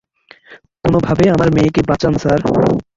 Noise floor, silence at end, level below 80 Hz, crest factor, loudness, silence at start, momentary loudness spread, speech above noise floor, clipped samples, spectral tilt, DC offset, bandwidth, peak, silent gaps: -45 dBFS; 0.15 s; -36 dBFS; 14 dB; -14 LUFS; 0.5 s; 4 LU; 33 dB; under 0.1%; -7.5 dB/octave; under 0.1%; 7.8 kHz; -2 dBFS; none